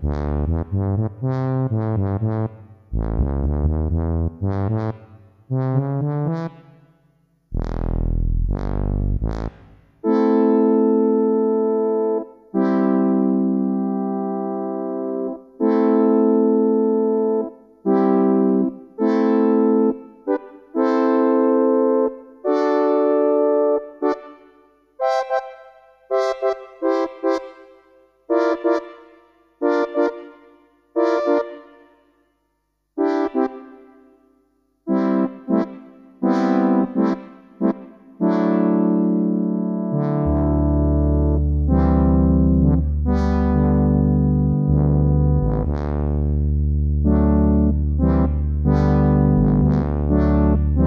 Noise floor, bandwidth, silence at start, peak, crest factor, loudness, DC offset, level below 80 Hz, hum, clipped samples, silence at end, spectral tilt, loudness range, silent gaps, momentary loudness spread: -71 dBFS; 6.2 kHz; 0 s; -4 dBFS; 16 dB; -20 LUFS; under 0.1%; -26 dBFS; 50 Hz at -50 dBFS; under 0.1%; 0 s; -10.5 dB/octave; 7 LU; none; 9 LU